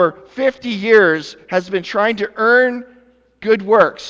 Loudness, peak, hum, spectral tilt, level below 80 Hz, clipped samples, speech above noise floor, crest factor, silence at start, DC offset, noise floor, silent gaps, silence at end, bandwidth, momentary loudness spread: -15 LUFS; 0 dBFS; none; -5.5 dB/octave; -60 dBFS; under 0.1%; 36 dB; 16 dB; 0 s; under 0.1%; -51 dBFS; none; 0 s; 7.6 kHz; 10 LU